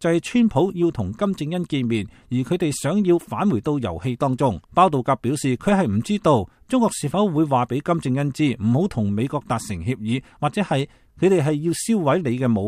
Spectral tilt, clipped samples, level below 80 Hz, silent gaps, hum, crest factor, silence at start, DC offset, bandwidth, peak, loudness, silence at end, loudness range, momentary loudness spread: -6.5 dB/octave; under 0.1%; -50 dBFS; none; none; 18 dB; 0 s; under 0.1%; 15 kHz; -2 dBFS; -21 LUFS; 0 s; 2 LU; 7 LU